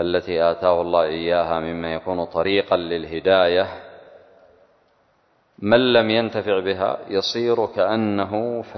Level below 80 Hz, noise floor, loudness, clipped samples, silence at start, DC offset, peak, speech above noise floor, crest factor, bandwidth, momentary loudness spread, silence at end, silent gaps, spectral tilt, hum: -50 dBFS; -62 dBFS; -20 LUFS; under 0.1%; 0 s; under 0.1%; -2 dBFS; 42 dB; 20 dB; 6.4 kHz; 9 LU; 0 s; none; -6 dB/octave; none